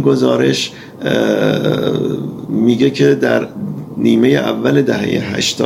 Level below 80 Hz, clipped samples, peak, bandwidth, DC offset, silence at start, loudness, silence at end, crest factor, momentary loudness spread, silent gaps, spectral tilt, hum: -52 dBFS; under 0.1%; 0 dBFS; 16 kHz; under 0.1%; 0 s; -14 LUFS; 0 s; 14 dB; 10 LU; none; -5.5 dB/octave; none